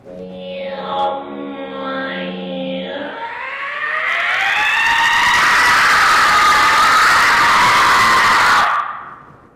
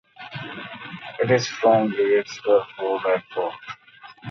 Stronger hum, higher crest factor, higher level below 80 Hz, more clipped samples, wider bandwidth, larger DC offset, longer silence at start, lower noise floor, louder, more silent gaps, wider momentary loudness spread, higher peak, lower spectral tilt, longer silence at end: neither; second, 10 dB vs 18 dB; first, -46 dBFS vs -66 dBFS; neither; first, 16 kHz vs 7.4 kHz; neither; second, 0.05 s vs 0.2 s; second, -38 dBFS vs -43 dBFS; first, -12 LUFS vs -22 LUFS; neither; about the same, 16 LU vs 18 LU; about the same, -6 dBFS vs -6 dBFS; second, -1.5 dB/octave vs -5.5 dB/octave; first, 0.35 s vs 0 s